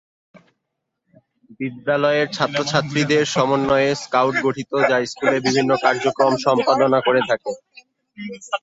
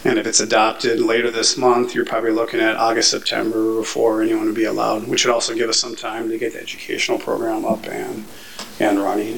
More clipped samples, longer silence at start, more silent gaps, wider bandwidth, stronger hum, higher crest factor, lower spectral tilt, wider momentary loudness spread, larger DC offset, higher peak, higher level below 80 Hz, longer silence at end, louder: neither; first, 1.5 s vs 0 s; neither; second, 8 kHz vs 17.5 kHz; neither; about the same, 18 dB vs 20 dB; first, -4.5 dB/octave vs -2.5 dB/octave; about the same, 12 LU vs 10 LU; second, under 0.1% vs 0.9%; about the same, -2 dBFS vs 0 dBFS; about the same, -58 dBFS vs -58 dBFS; about the same, 0.05 s vs 0 s; about the same, -19 LUFS vs -18 LUFS